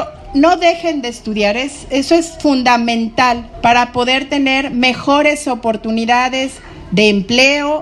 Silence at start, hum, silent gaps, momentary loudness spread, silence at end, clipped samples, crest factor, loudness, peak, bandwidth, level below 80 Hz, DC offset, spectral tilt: 0 s; none; none; 8 LU; 0 s; under 0.1%; 14 dB; -13 LUFS; 0 dBFS; 12 kHz; -40 dBFS; under 0.1%; -4 dB/octave